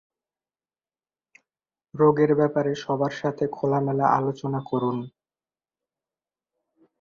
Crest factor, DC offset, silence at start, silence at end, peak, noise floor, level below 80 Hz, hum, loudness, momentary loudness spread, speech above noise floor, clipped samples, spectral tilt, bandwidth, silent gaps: 20 dB; under 0.1%; 1.95 s; 1.95 s; -6 dBFS; under -90 dBFS; -66 dBFS; none; -24 LUFS; 9 LU; over 67 dB; under 0.1%; -8 dB/octave; 7.2 kHz; none